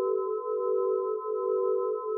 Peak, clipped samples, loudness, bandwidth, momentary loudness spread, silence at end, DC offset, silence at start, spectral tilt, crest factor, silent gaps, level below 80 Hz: -18 dBFS; under 0.1%; -29 LUFS; 1.4 kHz; 3 LU; 0 s; under 0.1%; 0 s; 13 dB/octave; 10 dB; none; under -90 dBFS